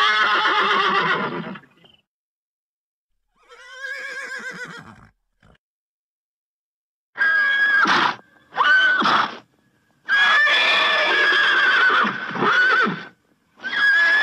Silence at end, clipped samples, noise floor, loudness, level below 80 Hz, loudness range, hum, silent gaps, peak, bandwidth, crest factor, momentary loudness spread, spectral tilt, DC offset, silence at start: 0 s; under 0.1%; under -90 dBFS; -17 LUFS; -68 dBFS; 19 LU; none; 2.07-3.10 s, 5.58-7.13 s; -8 dBFS; 12 kHz; 12 dB; 17 LU; -2.5 dB/octave; under 0.1%; 0 s